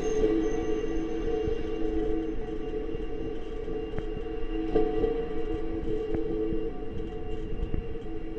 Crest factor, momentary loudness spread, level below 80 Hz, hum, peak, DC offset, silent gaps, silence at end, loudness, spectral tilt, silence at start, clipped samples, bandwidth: 16 dB; 9 LU; -36 dBFS; none; -12 dBFS; under 0.1%; none; 0 s; -32 LUFS; -7.5 dB/octave; 0 s; under 0.1%; 6.8 kHz